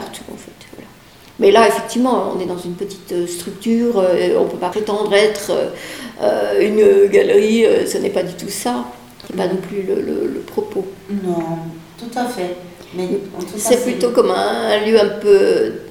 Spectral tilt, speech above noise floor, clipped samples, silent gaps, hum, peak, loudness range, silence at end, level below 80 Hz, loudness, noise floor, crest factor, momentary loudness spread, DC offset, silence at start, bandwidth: -4.5 dB/octave; 27 dB; under 0.1%; none; none; 0 dBFS; 8 LU; 0 s; -52 dBFS; -16 LUFS; -43 dBFS; 16 dB; 15 LU; 0.1%; 0 s; 16.5 kHz